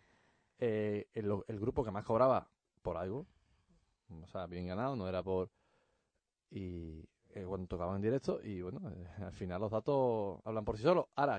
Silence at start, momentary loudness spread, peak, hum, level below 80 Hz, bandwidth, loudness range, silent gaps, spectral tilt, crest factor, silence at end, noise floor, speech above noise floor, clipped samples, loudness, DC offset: 0.6 s; 16 LU; -18 dBFS; none; -60 dBFS; 9 kHz; 6 LU; none; -8.5 dB/octave; 20 dB; 0 s; -86 dBFS; 49 dB; under 0.1%; -38 LUFS; under 0.1%